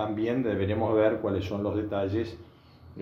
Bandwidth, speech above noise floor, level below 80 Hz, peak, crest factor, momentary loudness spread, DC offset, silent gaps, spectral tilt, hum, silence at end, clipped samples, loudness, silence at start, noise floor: 7 kHz; 21 dB; -60 dBFS; -12 dBFS; 16 dB; 7 LU; under 0.1%; none; -8.5 dB/octave; none; 0 s; under 0.1%; -28 LUFS; 0 s; -49 dBFS